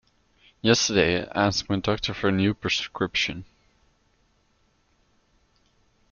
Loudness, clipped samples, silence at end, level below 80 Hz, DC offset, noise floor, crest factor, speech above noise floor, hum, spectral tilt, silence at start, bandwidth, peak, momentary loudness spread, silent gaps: -24 LUFS; under 0.1%; 2.65 s; -54 dBFS; under 0.1%; -66 dBFS; 22 dB; 42 dB; none; -4 dB/octave; 0.65 s; 7.2 kHz; -4 dBFS; 6 LU; none